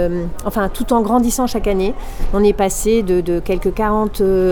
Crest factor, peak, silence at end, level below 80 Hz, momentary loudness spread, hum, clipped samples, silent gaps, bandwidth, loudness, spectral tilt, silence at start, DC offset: 14 dB; -2 dBFS; 0 s; -26 dBFS; 7 LU; none; under 0.1%; none; over 20 kHz; -17 LUFS; -5.5 dB/octave; 0 s; under 0.1%